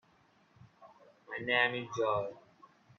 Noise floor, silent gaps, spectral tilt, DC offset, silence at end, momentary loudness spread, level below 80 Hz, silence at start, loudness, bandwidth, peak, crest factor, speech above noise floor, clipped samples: -68 dBFS; none; -4.5 dB/octave; under 0.1%; 0.6 s; 14 LU; -76 dBFS; 0.8 s; -33 LUFS; 7.4 kHz; -12 dBFS; 24 dB; 35 dB; under 0.1%